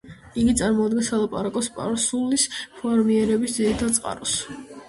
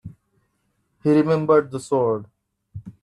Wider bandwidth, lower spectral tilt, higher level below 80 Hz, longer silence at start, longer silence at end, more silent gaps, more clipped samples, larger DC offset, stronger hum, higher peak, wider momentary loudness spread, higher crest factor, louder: about the same, 11.5 kHz vs 11 kHz; second, -3.5 dB/octave vs -7.5 dB/octave; first, -46 dBFS vs -60 dBFS; about the same, 0.05 s vs 0.05 s; about the same, 0.05 s vs 0.1 s; neither; neither; neither; neither; about the same, -6 dBFS vs -6 dBFS; second, 6 LU vs 22 LU; about the same, 18 dB vs 18 dB; about the same, -22 LUFS vs -20 LUFS